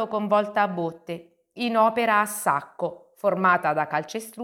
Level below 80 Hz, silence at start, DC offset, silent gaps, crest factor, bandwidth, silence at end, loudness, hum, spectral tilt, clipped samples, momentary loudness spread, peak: -74 dBFS; 0 s; under 0.1%; none; 18 dB; 17.5 kHz; 0 s; -24 LUFS; none; -4.5 dB/octave; under 0.1%; 12 LU; -6 dBFS